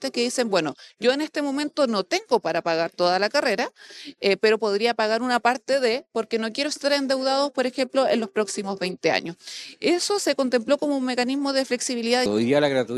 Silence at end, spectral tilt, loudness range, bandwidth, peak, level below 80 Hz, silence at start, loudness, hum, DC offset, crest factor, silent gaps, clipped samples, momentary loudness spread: 0 s; -3.5 dB/octave; 2 LU; 14 kHz; -6 dBFS; -70 dBFS; 0 s; -23 LUFS; none; under 0.1%; 18 dB; none; under 0.1%; 6 LU